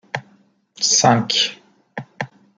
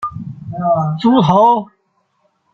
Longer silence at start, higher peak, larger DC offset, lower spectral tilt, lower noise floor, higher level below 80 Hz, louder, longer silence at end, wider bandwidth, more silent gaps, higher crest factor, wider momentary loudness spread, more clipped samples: first, 0.15 s vs 0 s; about the same, -2 dBFS vs 0 dBFS; neither; second, -2.5 dB/octave vs -8.5 dB/octave; second, -56 dBFS vs -63 dBFS; second, -62 dBFS vs -54 dBFS; second, -16 LUFS vs -13 LUFS; second, 0.3 s vs 0.9 s; first, 10.5 kHz vs 7.2 kHz; neither; first, 20 dB vs 14 dB; first, 21 LU vs 16 LU; neither